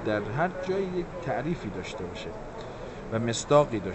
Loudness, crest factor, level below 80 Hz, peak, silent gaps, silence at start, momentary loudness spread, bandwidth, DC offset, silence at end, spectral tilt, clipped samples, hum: -29 LUFS; 22 dB; -48 dBFS; -8 dBFS; none; 0 s; 16 LU; 8.2 kHz; under 0.1%; 0 s; -5.5 dB/octave; under 0.1%; none